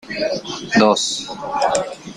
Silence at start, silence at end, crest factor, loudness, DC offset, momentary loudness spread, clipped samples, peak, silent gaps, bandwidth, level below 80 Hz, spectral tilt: 0.05 s; 0 s; 18 dB; -19 LUFS; under 0.1%; 11 LU; under 0.1%; -2 dBFS; none; 11.5 kHz; -54 dBFS; -3 dB/octave